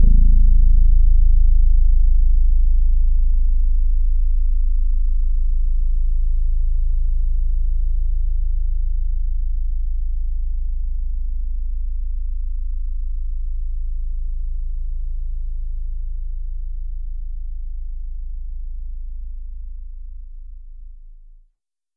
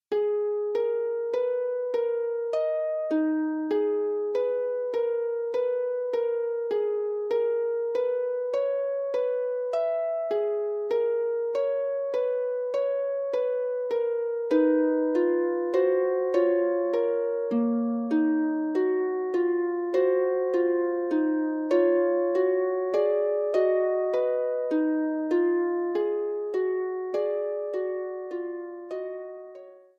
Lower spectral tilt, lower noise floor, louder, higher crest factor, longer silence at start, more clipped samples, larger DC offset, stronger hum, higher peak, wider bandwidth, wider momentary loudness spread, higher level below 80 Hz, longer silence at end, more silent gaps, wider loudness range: first, -13 dB/octave vs -6.5 dB/octave; first, -67 dBFS vs -47 dBFS; about the same, -25 LUFS vs -27 LUFS; about the same, 12 dB vs 14 dB; about the same, 0 s vs 0.1 s; neither; neither; neither; first, -4 dBFS vs -12 dBFS; second, 0.4 kHz vs 6.6 kHz; first, 16 LU vs 5 LU; first, -16 dBFS vs -80 dBFS; first, 0.85 s vs 0.2 s; neither; first, 14 LU vs 3 LU